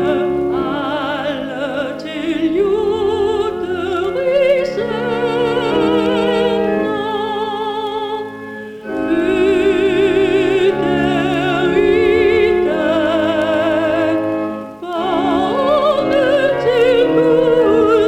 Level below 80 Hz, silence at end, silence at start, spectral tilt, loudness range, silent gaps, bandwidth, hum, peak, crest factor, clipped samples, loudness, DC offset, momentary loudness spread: -42 dBFS; 0 s; 0 s; -6 dB/octave; 4 LU; none; 11.5 kHz; none; -2 dBFS; 14 dB; under 0.1%; -16 LUFS; under 0.1%; 9 LU